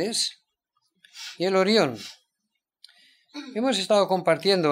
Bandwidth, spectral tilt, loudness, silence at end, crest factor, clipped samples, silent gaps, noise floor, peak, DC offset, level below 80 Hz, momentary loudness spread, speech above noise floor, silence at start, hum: 16 kHz; -4 dB/octave; -23 LUFS; 0 s; 18 dB; under 0.1%; none; -81 dBFS; -8 dBFS; under 0.1%; -78 dBFS; 19 LU; 58 dB; 0 s; none